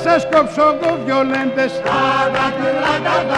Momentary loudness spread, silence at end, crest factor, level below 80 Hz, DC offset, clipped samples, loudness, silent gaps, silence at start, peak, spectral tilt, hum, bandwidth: 4 LU; 0 s; 14 dB; -48 dBFS; under 0.1%; under 0.1%; -16 LUFS; none; 0 s; -2 dBFS; -5 dB/octave; none; 11 kHz